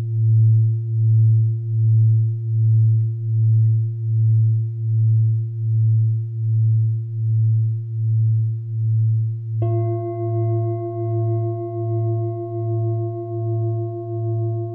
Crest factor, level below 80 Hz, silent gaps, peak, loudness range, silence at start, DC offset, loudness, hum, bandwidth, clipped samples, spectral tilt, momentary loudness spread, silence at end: 8 dB; -60 dBFS; none; -10 dBFS; 6 LU; 0 s; under 0.1%; -20 LUFS; none; 1.2 kHz; under 0.1%; -15 dB/octave; 8 LU; 0 s